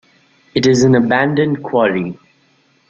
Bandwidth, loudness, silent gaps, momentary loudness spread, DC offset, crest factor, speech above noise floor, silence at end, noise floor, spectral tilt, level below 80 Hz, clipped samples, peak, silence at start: 8 kHz; -14 LUFS; none; 10 LU; under 0.1%; 14 dB; 42 dB; 0.75 s; -56 dBFS; -6 dB/octave; -52 dBFS; under 0.1%; -2 dBFS; 0.55 s